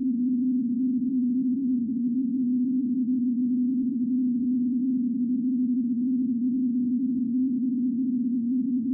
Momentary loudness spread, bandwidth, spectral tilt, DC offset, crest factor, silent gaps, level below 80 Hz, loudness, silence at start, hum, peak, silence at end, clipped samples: 1 LU; 0.6 kHz; -18 dB/octave; under 0.1%; 6 dB; none; -72 dBFS; -26 LUFS; 0 s; none; -20 dBFS; 0 s; under 0.1%